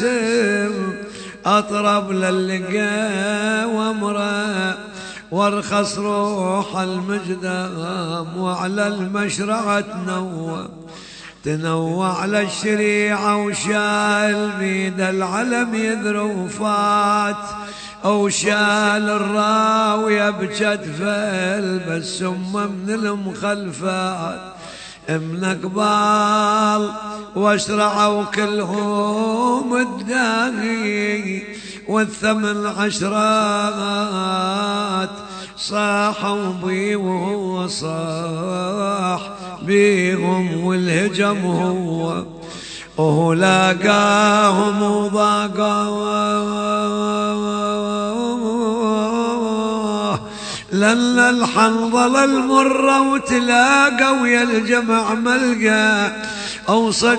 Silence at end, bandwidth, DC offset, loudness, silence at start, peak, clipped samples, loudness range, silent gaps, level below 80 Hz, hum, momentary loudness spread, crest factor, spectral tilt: 0 s; 9.2 kHz; under 0.1%; -18 LUFS; 0 s; 0 dBFS; under 0.1%; 7 LU; none; -54 dBFS; none; 11 LU; 18 dB; -4.5 dB/octave